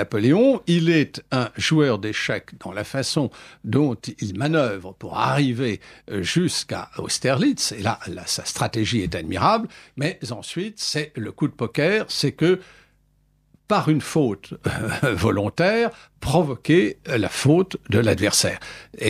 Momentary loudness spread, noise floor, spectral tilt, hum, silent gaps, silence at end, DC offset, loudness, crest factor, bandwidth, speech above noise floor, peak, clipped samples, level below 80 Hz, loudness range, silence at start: 11 LU; -62 dBFS; -5 dB/octave; none; none; 0 s; under 0.1%; -22 LUFS; 18 dB; 15 kHz; 40 dB; -4 dBFS; under 0.1%; -50 dBFS; 4 LU; 0 s